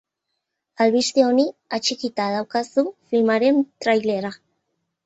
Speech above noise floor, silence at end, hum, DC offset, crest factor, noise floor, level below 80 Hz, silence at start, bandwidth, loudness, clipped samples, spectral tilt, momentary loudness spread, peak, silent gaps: 59 dB; 0.7 s; none; under 0.1%; 16 dB; -79 dBFS; -68 dBFS; 0.8 s; 8.2 kHz; -21 LUFS; under 0.1%; -4 dB/octave; 7 LU; -4 dBFS; none